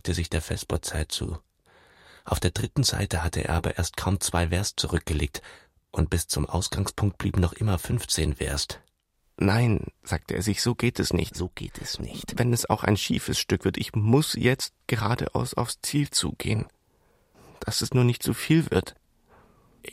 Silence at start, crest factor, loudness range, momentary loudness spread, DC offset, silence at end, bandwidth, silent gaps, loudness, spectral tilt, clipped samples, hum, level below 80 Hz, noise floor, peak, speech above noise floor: 0.05 s; 20 dB; 3 LU; 10 LU; under 0.1%; 0 s; 16 kHz; none; -26 LUFS; -4.5 dB/octave; under 0.1%; none; -40 dBFS; -70 dBFS; -6 dBFS; 44 dB